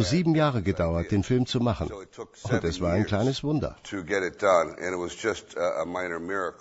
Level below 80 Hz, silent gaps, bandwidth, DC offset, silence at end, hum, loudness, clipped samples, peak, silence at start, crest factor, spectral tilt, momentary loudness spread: -46 dBFS; none; 8 kHz; under 0.1%; 0.05 s; none; -27 LUFS; under 0.1%; -8 dBFS; 0 s; 18 dB; -6 dB/octave; 9 LU